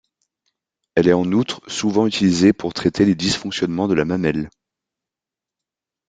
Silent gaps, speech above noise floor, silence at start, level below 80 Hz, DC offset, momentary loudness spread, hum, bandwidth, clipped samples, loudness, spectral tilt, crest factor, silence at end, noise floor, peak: none; 70 dB; 0.95 s; -52 dBFS; under 0.1%; 7 LU; none; 9.4 kHz; under 0.1%; -19 LUFS; -5.5 dB/octave; 20 dB; 1.6 s; -88 dBFS; 0 dBFS